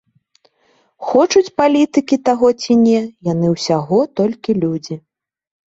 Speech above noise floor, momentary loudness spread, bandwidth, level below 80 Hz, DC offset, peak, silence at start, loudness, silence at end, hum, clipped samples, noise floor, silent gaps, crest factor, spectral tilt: 44 dB; 8 LU; 8 kHz; -56 dBFS; under 0.1%; 0 dBFS; 1 s; -15 LUFS; 0.7 s; none; under 0.1%; -59 dBFS; none; 16 dB; -6 dB/octave